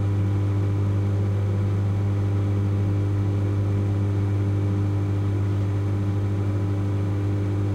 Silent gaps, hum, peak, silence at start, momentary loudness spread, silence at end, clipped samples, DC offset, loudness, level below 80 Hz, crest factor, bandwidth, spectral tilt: none; 50 Hz at -25 dBFS; -14 dBFS; 0 s; 1 LU; 0 s; under 0.1%; under 0.1%; -24 LUFS; -46 dBFS; 8 dB; 6.6 kHz; -9 dB/octave